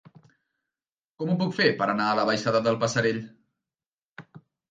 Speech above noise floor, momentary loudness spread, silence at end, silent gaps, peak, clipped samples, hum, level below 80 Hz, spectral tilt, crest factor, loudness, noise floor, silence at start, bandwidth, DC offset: over 66 dB; 10 LU; 0.35 s; 3.86-4.16 s; -6 dBFS; under 0.1%; none; -66 dBFS; -5 dB/octave; 22 dB; -25 LUFS; under -90 dBFS; 1.2 s; 9.2 kHz; under 0.1%